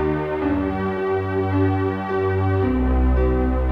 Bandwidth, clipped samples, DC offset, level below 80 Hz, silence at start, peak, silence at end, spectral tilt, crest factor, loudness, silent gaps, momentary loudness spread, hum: 4.9 kHz; under 0.1%; under 0.1%; -26 dBFS; 0 s; -10 dBFS; 0 s; -10 dB/octave; 10 dB; -21 LUFS; none; 3 LU; none